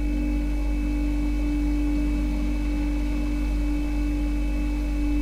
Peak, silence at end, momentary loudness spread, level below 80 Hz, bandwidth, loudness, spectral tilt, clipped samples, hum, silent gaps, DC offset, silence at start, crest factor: -14 dBFS; 0 s; 2 LU; -26 dBFS; 10 kHz; -27 LUFS; -7.5 dB/octave; under 0.1%; none; none; under 0.1%; 0 s; 8 dB